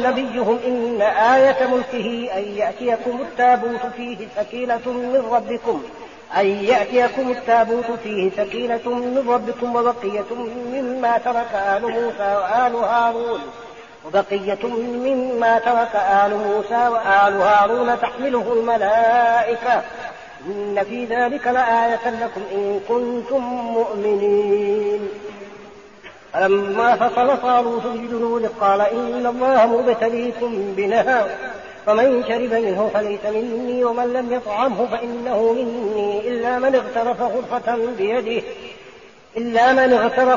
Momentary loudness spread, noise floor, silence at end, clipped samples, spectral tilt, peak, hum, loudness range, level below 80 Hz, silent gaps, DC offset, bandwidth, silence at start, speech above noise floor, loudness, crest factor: 10 LU; -44 dBFS; 0 s; under 0.1%; -2.5 dB/octave; -4 dBFS; none; 4 LU; -58 dBFS; none; 0.2%; 7.2 kHz; 0 s; 25 dB; -19 LUFS; 14 dB